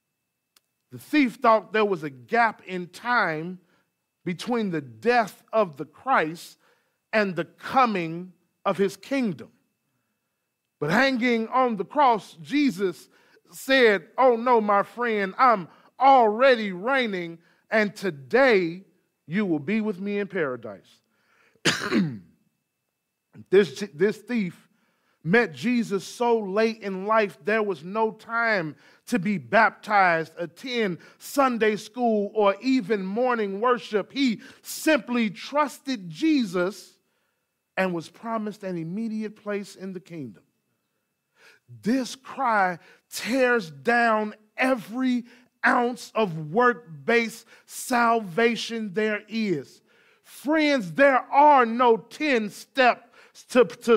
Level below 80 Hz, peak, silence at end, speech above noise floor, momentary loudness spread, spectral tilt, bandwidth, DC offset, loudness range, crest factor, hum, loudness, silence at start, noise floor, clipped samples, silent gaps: -72 dBFS; -6 dBFS; 0 s; 56 dB; 13 LU; -5 dB/octave; 16 kHz; under 0.1%; 8 LU; 18 dB; none; -24 LUFS; 0.95 s; -80 dBFS; under 0.1%; none